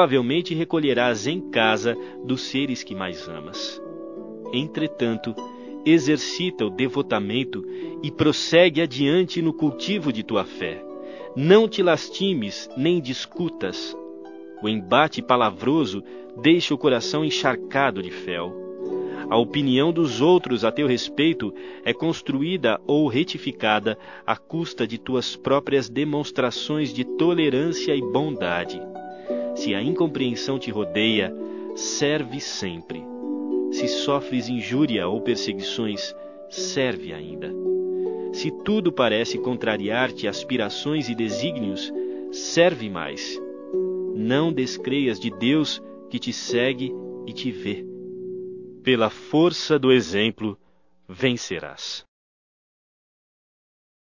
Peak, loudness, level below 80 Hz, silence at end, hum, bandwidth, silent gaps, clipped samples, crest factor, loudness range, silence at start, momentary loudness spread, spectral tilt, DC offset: 0 dBFS; -23 LUFS; -60 dBFS; 2.05 s; none; 7.4 kHz; none; under 0.1%; 24 dB; 5 LU; 0 s; 13 LU; -5 dB/octave; 0.1%